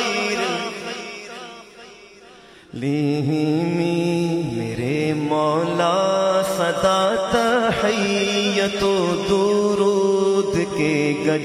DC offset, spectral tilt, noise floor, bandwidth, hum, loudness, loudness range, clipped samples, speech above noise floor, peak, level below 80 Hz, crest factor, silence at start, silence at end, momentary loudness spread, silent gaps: under 0.1%; -5 dB/octave; -45 dBFS; 15.5 kHz; none; -20 LUFS; 6 LU; under 0.1%; 26 dB; -4 dBFS; -52 dBFS; 16 dB; 0 s; 0 s; 10 LU; none